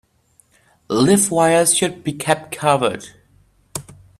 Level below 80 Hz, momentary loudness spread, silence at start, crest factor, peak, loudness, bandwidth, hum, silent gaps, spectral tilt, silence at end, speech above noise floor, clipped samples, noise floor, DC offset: -54 dBFS; 18 LU; 0.9 s; 18 dB; 0 dBFS; -17 LUFS; 15.5 kHz; none; none; -3.5 dB/octave; 0.4 s; 41 dB; under 0.1%; -58 dBFS; under 0.1%